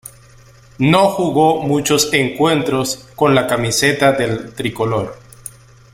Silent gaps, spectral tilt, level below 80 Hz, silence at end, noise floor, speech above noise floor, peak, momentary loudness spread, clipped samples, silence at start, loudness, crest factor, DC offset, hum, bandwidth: none; -4.5 dB/octave; -48 dBFS; 0.45 s; -44 dBFS; 29 dB; 0 dBFS; 11 LU; under 0.1%; 0.8 s; -15 LUFS; 16 dB; under 0.1%; none; 16.5 kHz